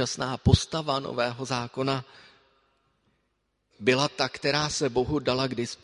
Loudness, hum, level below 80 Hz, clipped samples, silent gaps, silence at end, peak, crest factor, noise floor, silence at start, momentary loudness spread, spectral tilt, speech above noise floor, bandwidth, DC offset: -27 LUFS; none; -42 dBFS; under 0.1%; none; 0.1 s; -4 dBFS; 24 dB; -75 dBFS; 0 s; 6 LU; -4.5 dB/octave; 49 dB; 11.5 kHz; under 0.1%